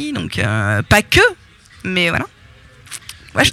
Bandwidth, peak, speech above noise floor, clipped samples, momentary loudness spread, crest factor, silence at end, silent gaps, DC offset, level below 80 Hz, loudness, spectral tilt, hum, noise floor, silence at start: 17 kHz; 0 dBFS; 28 dB; under 0.1%; 19 LU; 18 dB; 0 s; none; under 0.1%; -36 dBFS; -15 LUFS; -4 dB/octave; none; -44 dBFS; 0 s